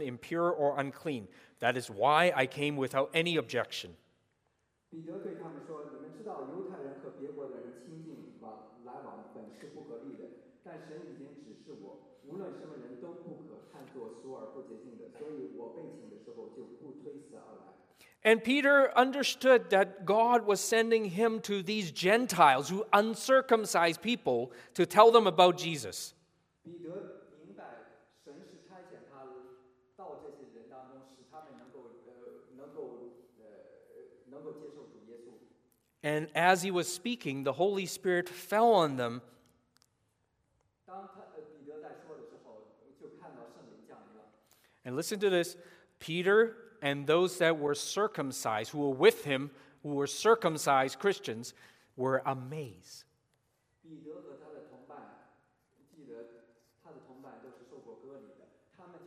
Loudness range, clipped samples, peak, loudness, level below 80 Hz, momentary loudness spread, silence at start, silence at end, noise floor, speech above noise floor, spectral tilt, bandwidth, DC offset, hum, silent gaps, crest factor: 25 LU; under 0.1%; -8 dBFS; -29 LUFS; -82 dBFS; 26 LU; 0 s; 0.1 s; -78 dBFS; 48 dB; -4 dB/octave; 15.5 kHz; under 0.1%; none; none; 26 dB